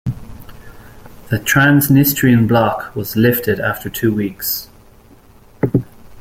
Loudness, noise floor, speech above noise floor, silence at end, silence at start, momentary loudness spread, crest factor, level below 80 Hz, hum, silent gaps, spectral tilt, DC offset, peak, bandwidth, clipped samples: -15 LUFS; -44 dBFS; 30 dB; 0 s; 0.05 s; 12 LU; 16 dB; -42 dBFS; none; none; -5.5 dB/octave; under 0.1%; -2 dBFS; 16.5 kHz; under 0.1%